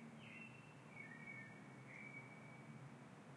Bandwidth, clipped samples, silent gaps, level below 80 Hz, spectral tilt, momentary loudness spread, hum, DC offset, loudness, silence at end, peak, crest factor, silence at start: 11.5 kHz; under 0.1%; none; under -90 dBFS; -5.5 dB/octave; 5 LU; none; under 0.1%; -57 LUFS; 0 s; -42 dBFS; 14 dB; 0 s